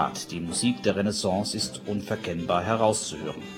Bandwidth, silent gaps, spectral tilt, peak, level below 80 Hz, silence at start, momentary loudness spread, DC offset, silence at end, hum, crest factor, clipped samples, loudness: 16.5 kHz; none; -4 dB/octave; -8 dBFS; -56 dBFS; 0 s; 9 LU; under 0.1%; 0 s; none; 20 dB; under 0.1%; -27 LUFS